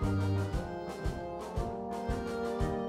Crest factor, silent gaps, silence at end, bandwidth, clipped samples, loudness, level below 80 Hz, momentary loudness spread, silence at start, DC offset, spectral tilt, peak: 14 dB; none; 0 s; 13.5 kHz; under 0.1%; -36 LUFS; -42 dBFS; 7 LU; 0 s; under 0.1%; -7.5 dB/octave; -20 dBFS